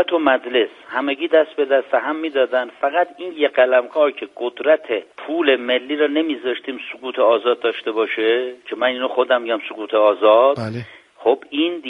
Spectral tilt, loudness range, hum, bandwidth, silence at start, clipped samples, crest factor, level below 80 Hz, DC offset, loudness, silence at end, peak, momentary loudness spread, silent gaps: -6.5 dB/octave; 2 LU; none; 5.6 kHz; 0 s; under 0.1%; 16 dB; -68 dBFS; under 0.1%; -19 LUFS; 0 s; -2 dBFS; 10 LU; none